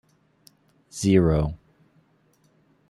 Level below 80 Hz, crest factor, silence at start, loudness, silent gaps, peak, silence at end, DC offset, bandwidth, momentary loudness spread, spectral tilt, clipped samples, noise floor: -42 dBFS; 22 dB; 0.95 s; -22 LUFS; none; -6 dBFS; 1.35 s; under 0.1%; 12.5 kHz; 22 LU; -7 dB/octave; under 0.1%; -63 dBFS